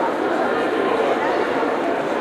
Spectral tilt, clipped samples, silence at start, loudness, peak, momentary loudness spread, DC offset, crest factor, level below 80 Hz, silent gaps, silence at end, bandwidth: -5 dB/octave; under 0.1%; 0 s; -20 LUFS; -8 dBFS; 2 LU; under 0.1%; 12 dB; -60 dBFS; none; 0 s; 14.5 kHz